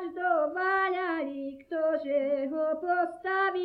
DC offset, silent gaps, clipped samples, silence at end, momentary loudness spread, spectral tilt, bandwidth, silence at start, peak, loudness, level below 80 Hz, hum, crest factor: under 0.1%; none; under 0.1%; 0 s; 6 LU; -5.5 dB/octave; 5.2 kHz; 0 s; -14 dBFS; -29 LUFS; -72 dBFS; none; 14 dB